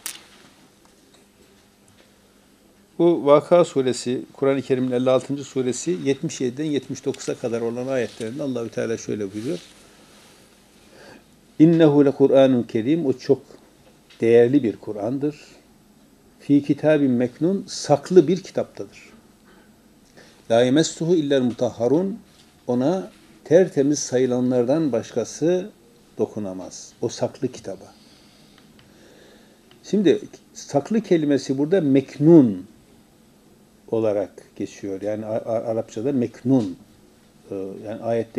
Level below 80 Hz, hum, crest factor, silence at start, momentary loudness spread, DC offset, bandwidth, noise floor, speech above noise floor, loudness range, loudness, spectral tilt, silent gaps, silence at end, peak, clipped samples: -66 dBFS; none; 22 dB; 0.05 s; 16 LU; under 0.1%; 14.5 kHz; -55 dBFS; 35 dB; 9 LU; -21 LUFS; -6.5 dB/octave; none; 0 s; 0 dBFS; under 0.1%